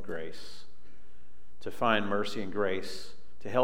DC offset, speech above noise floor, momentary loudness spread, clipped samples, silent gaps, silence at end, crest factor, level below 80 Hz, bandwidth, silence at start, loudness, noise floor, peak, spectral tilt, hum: 3%; 29 dB; 20 LU; under 0.1%; none; 0 s; 24 dB; -64 dBFS; 16 kHz; 0 s; -32 LUFS; -62 dBFS; -10 dBFS; -5 dB/octave; none